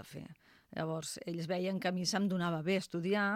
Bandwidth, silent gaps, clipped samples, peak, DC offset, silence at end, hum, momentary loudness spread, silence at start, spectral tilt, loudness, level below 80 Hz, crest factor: 16 kHz; none; under 0.1%; -20 dBFS; under 0.1%; 0 s; none; 14 LU; 0 s; -5 dB/octave; -36 LUFS; -74 dBFS; 16 dB